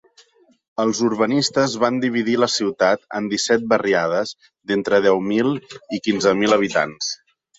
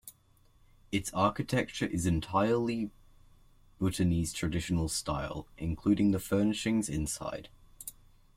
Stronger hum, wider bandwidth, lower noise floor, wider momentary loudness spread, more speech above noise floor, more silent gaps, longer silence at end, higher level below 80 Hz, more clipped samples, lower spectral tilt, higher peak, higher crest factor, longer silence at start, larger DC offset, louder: neither; second, 8.4 kHz vs 16.5 kHz; second, -54 dBFS vs -64 dBFS; about the same, 10 LU vs 12 LU; about the same, 35 dB vs 34 dB; neither; about the same, 0.45 s vs 0.45 s; second, -60 dBFS vs -50 dBFS; neither; second, -4 dB/octave vs -5.5 dB/octave; first, -2 dBFS vs -14 dBFS; about the same, 18 dB vs 20 dB; first, 0.8 s vs 0.05 s; neither; first, -19 LUFS vs -32 LUFS